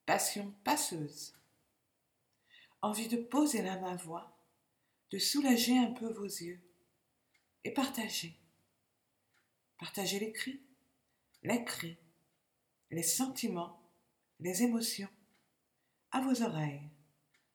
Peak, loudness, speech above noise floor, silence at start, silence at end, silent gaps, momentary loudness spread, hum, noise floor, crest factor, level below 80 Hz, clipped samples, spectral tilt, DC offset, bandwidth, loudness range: -16 dBFS; -35 LUFS; 46 dB; 0.05 s; 0.65 s; none; 16 LU; none; -81 dBFS; 22 dB; -82 dBFS; under 0.1%; -3.5 dB/octave; under 0.1%; 20 kHz; 7 LU